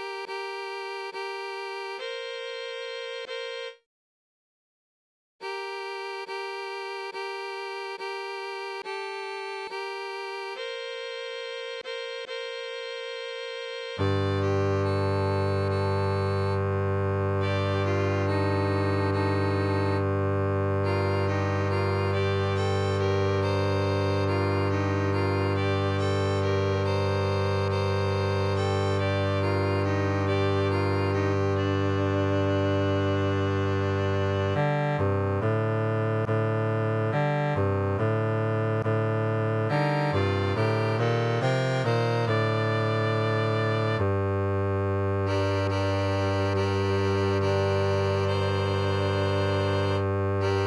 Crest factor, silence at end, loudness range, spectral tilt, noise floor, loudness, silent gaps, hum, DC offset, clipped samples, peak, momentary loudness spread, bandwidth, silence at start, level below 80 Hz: 14 dB; 0 s; 9 LU; -7 dB/octave; under -90 dBFS; -27 LUFS; 3.86-5.39 s; none; under 0.1%; under 0.1%; -14 dBFS; 9 LU; 11 kHz; 0 s; -66 dBFS